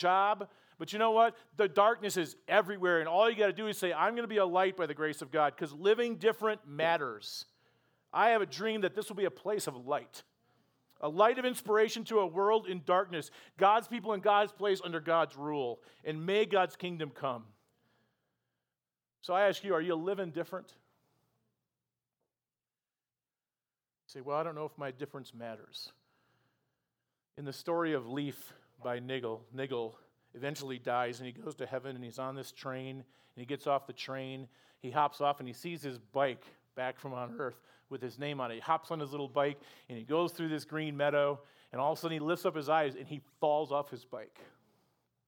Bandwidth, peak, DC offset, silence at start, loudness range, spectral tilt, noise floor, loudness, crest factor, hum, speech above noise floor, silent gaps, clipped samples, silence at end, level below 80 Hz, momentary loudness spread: over 20 kHz; -10 dBFS; under 0.1%; 0 s; 12 LU; -5 dB/octave; under -90 dBFS; -33 LUFS; 24 dB; none; over 57 dB; none; under 0.1%; 0.85 s; under -90 dBFS; 17 LU